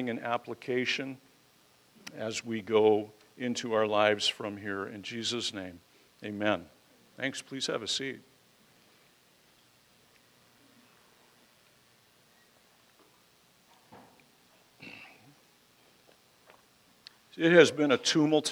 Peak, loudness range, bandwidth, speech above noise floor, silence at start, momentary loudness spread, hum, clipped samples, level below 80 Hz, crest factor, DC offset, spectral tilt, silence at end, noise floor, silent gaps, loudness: -6 dBFS; 10 LU; 16.5 kHz; 35 dB; 0 s; 23 LU; none; under 0.1%; -80 dBFS; 26 dB; under 0.1%; -4 dB/octave; 0 s; -64 dBFS; none; -29 LUFS